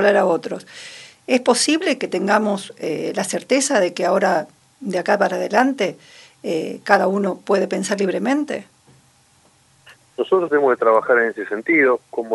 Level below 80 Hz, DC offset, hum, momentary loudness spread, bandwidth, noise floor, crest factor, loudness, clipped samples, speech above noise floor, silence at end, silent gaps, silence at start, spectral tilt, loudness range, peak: -72 dBFS; under 0.1%; none; 13 LU; 11.5 kHz; -56 dBFS; 20 dB; -19 LUFS; under 0.1%; 37 dB; 0 s; none; 0 s; -4 dB/octave; 3 LU; 0 dBFS